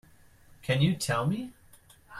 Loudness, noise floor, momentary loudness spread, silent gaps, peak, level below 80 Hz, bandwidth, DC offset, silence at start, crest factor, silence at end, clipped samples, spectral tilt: -28 LUFS; -57 dBFS; 15 LU; none; -12 dBFS; -58 dBFS; 15.5 kHz; under 0.1%; 0.6 s; 18 dB; 0 s; under 0.1%; -5.5 dB/octave